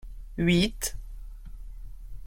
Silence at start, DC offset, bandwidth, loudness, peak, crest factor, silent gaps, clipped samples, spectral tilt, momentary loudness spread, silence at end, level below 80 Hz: 0.05 s; under 0.1%; 16.5 kHz; -26 LUFS; -12 dBFS; 18 dB; none; under 0.1%; -4.5 dB/octave; 24 LU; 0 s; -40 dBFS